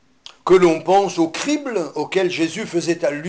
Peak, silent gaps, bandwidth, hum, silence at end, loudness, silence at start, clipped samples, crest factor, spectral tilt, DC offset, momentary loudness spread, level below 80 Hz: -4 dBFS; none; 9.6 kHz; none; 0 s; -18 LUFS; 0.45 s; under 0.1%; 14 dB; -5 dB/octave; under 0.1%; 9 LU; -54 dBFS